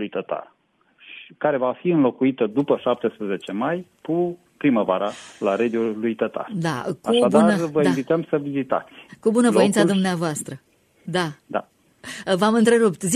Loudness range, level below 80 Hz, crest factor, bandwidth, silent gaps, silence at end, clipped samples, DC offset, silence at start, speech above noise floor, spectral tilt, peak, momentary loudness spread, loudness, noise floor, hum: 4 LU; -66 dBFS; 18 dB; 14 kHz; none; 0 s; under 0.1%; under 0.1%; 0 s; 36 dB; -5.5 dB/octave; -4 dBFS; 13 LU; -22 LUFS; -57 dBFS; none